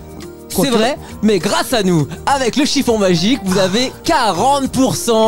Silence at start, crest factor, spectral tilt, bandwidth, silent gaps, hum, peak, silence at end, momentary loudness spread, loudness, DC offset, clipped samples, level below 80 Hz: 0 s; 12 dB; -4.5 dB/octave; 16.5 kHz; none; none; -4 dBFS; 0 s; 5 LU; -15 LUFS; 2%; under 0.1%; -40 dBFS